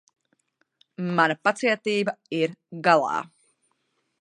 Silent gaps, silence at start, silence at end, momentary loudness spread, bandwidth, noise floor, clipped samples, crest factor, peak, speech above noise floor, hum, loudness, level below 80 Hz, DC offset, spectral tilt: none; 1 s; 0.95 s; 9 LU; 10.5 kHz; -73 dBFS; under 0.1%; 24 dB; -4 dBFS; 50 dB; none; -24 LUFS; -78 dBFS; under 0.1%; -5 dB/octave